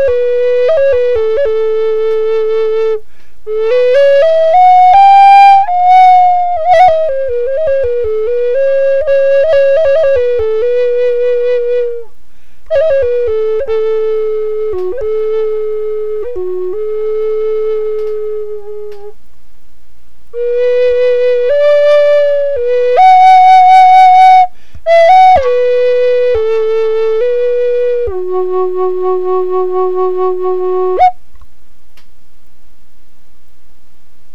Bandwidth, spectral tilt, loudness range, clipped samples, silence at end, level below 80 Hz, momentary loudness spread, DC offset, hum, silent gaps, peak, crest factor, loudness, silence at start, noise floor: 7.6 kHz; -5 dB/octave; 11 LU; 0.3%; 3.2 s; -42 dBFS; 13 LU; 10%; none; none; 0 dBFS; 10 dB; -9 LUFS; 0 s; -48 dBFS